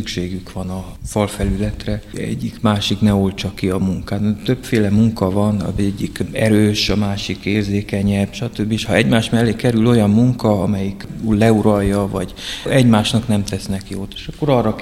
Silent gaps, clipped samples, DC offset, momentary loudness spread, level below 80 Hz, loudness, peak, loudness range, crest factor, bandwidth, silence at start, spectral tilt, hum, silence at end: none; under 0.1%; under 0.1%; 11 LU; -34 dBFS; -17 LUFS; 0 dBFS; 4 LU; 16 dB; 15 kHz; 0 s; -6 dB/octave; none; 0 s